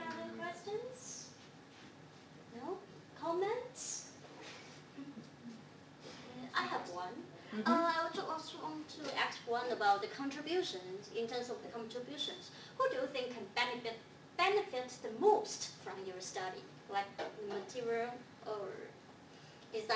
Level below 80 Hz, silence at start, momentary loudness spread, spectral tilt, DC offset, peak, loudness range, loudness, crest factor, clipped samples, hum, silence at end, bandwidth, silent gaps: -80 dBFS; 0 s; 20 LU; -3 dB/octave; under 0.1%; -18 dBFS; 8 LU; -39 LUFS; 22 dB; under 0.1%; none; 0 s; 8 kHz; none